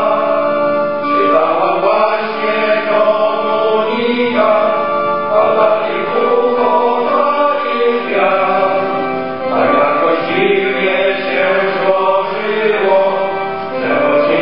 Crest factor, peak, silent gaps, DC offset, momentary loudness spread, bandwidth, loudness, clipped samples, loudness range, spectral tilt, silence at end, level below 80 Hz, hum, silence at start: 14 dB; 0 dBFS; none; 2%; 4 LU; 5.6 kHz; -13 LUFS; under 0.1%; 1 LU; -8 dB/octave; 0 s; -60 dBFS; none; 0 s